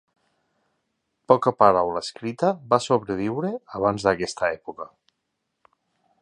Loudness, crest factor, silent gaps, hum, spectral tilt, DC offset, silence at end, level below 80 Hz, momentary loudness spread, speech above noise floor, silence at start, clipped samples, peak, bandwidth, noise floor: -23 LUFS; 24 dB; none; none; -5.5 dB/octave; under 0.1%; 1.35 s; -58 dBFS; 14 LU; 56 dB; 1.3 s; under 0.1%; -2 dBFS; 10.5 kHz; -78 dBFS